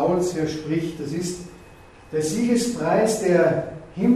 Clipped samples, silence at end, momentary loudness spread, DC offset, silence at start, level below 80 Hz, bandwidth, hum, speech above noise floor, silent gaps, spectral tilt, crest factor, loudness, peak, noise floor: under 0.1%; 0 s; 11 LU; under 0.1%; 0 s; -52 dBFS; 14.5 kHz; none; 24 dB; none; -5.5 dB/octave; 16 dB; -23 LUFS; -6 dBFS; -46 dBFS